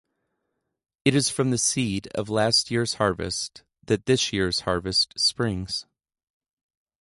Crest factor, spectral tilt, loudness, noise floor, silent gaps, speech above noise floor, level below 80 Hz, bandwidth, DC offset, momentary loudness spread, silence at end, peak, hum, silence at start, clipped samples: 22 dB; -3.5 dB/octave; -24 LUFS; -79 dBFS; none; 55 dB; -50 dBFS; 11.5 kHz; under 0.1%; 9 LU; 1.2 s; -4 dBFS; none; 1.05 s; under 0.1%